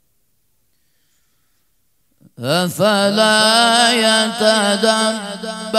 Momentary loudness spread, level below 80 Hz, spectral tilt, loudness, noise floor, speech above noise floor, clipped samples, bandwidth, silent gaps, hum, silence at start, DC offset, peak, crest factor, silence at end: 12 LU; -68 dBFS; -2.5 dB/octave; -14 LUFS; -66 dBFS; 51 dB; under 0.1%; 16 kHz; none; none; 2.4 s; under 0.1%; 0 dBFS; 18 dB; 0 s